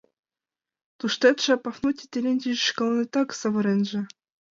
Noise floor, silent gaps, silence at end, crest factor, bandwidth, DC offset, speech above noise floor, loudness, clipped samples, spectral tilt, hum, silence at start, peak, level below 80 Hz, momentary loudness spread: under -90 dBFS; none; 0.45 s; 20 dB; 7.6 kHz; under 0.1%; over 66 dB; -24 LUFS; under 0.1%; -4.5 dB/octave; none; 1.05 s; -6 dBFS; -70 dBFS; 8 LU